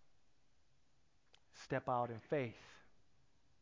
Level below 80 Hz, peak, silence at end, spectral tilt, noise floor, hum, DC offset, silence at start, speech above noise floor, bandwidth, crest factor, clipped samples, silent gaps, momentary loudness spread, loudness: -76 dBFS; -26 dBFS; 0.85 s; -6.5 dB/octave; -79 dBFS; none; under 0.1%; 1.55 s; 37 dB; 7.6 kHz; 20 dB; under 0.1%; none; 20 LU; -42 LUFS